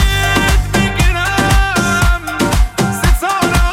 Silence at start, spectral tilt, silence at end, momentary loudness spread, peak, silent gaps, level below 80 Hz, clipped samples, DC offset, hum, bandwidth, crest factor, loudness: 0 s; -4.5 dB/octave; 0 s; 3 LU; 0 dBFS; none; -16 dBFS; under 0.1%; under 0.1%; none; 16.5 kHz; 12 dB; -13 LUFS